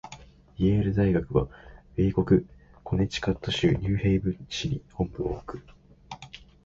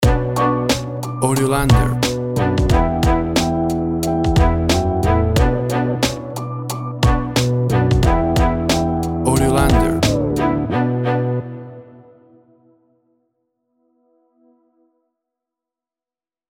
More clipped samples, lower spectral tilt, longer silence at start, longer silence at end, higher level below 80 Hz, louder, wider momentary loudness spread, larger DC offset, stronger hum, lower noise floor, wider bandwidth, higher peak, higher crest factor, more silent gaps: neither; about the same, -7 dB/octave vs -6 dB/octave; about the same, 0.05 s vs 0 s; second, 0.3 s vs 4.65 s; second, -42 dBFS vs -26 dBFS; second, -27 LUFS vs -17 LUFS; first, 20 LU vs 7 LU; neither; neither; second, -49 dBFS vs under -90 dBFS; second, 7.6 kHz vs 17 kHz; second, -8 dBFS vs 0 dBFS; about the same, 18 dB vs 16 dB; neither